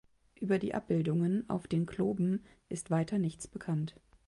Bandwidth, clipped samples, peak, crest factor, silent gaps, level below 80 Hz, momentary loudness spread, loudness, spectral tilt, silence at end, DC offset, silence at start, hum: 11.5 kHz; under 0.1%; -18 dBFS; 16 dB; none; -64 dBFS; 11 LU; -34 LUFS; -7.5 dB/octave; 0.35 s; under 0.1%; 0.4 s; none